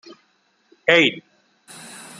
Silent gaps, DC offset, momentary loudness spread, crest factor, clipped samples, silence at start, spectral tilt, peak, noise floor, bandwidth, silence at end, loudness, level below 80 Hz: none; under 0.1%; 24 LU; 24 dB; under 0.1%; 0.85 s; -3.5 dB/octave; 0 dBFS; -64 dBFS; 13 kHz; 1 s; -17 LUFS; -68 dBFS